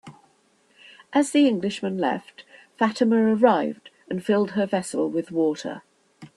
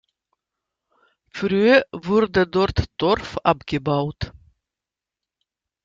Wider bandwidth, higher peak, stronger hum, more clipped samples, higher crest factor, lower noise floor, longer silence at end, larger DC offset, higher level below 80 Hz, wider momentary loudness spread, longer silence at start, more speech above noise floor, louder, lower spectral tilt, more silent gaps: first, 12 kHz vs 7.6 kHz; about the same, -4 dBFS vs -2 dBFS; neither; neither; about the same, 20 dB vs 20 dB; second, -62 dBFS vs -88 dBFS; second, 0.1 s vs 1.55 s; neither; second, -70 dBFS vs -44 dBFS; about the same, 13 LU vs 13 LU; second, 0.05 s vs 1.35 s; second, 40 dB vs 68 dB; second, -23 LUFS vs -20 LUFS; second, -5.5 dB/octave vs -7 dB/octave; neither